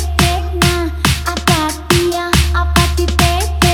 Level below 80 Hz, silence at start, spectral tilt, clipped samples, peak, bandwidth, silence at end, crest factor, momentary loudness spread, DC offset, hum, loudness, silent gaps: -18 dBFS; 0 s; -4 dB/octave; under 0.1%; 0 dBFS; 18.5 kHz; 0 s; 14 dB; 2 LU; under 0.1%; none; -14 LUFS; none